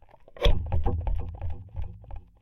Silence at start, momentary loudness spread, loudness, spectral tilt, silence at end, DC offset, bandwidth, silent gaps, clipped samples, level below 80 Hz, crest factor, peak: 0.35 s; 15 LU; -32 LUFS; -6.5 dB/octave; 0.2 s; under 0.1%; 6.4 kHz; none; under 0.1%; -30 dBFS; 18 dB; -10 dBFS